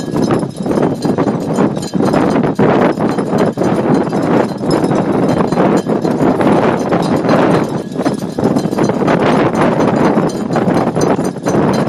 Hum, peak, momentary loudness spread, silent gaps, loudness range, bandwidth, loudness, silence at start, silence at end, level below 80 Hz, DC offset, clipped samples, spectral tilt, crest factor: none; 0 dBFS; 4 LU; none; 1 LU; 13 kHz; -13 LUFS; 0 s; 0 s; -44 dBFS; under 0.1%; under 0.1%; -7 dB/octave; 12 dB